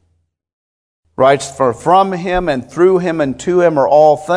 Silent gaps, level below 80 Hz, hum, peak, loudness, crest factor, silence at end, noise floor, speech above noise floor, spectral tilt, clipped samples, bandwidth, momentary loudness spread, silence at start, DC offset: none; -40 dBFS; none; 0 dBFS; -13 LUFS; 14 dB; 0 s; -63 dBFS; 51 dB; -6 dB/octave; 0.1%; 11 kHz; 7 LU; 1.2 s; under 0.1%